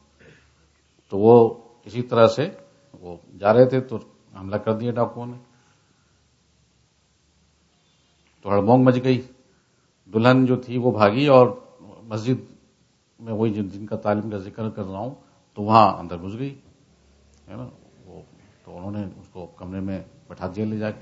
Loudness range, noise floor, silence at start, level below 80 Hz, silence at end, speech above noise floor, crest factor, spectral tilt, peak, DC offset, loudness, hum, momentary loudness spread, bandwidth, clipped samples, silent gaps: 16 LU; -63 dBFS; 1.1 s; -62 dBFS; 0 s; 43 dB; 22 dB; -8 dB/octave; 0 dBFS; under 0.1%; -21 LUFS; none; 23 LU; 7.8 kHz; under 0.1%; none